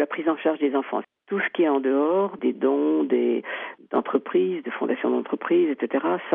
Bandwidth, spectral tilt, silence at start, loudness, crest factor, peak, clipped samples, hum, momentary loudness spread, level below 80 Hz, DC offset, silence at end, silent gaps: 3.7 kHz; -4 dB/octave; 0 s; -24 LUFS; 16 dB; -8 dBFS; under 0.1%; none; 6 LU; -80 dBFS; under 0.1%; 0 s; none